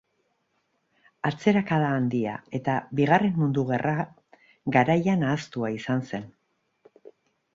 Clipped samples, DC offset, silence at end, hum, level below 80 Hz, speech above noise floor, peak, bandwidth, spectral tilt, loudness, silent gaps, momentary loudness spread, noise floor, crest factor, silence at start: under 0.1%; under 0.1%; 1.25 s; none; -64 dBFS; 49 dB; -6 dBFS; 7.6 kHz; -7.5 dB/octave; -25 LUFS; none; 9 LU; -73 dBFS; 22 dB; 1.25 s